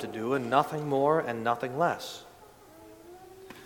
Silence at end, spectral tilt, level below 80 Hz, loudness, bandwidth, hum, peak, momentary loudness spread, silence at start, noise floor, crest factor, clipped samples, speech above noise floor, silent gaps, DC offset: 0 s; -6 dB/octave; -68 dBFS; -28 LUFS; 19 kHz; none; -10 dBFS; 24 LU; 0 s; -53 dBFS; 22 dB; under 0.1%; 25 dB; none; under 0.1%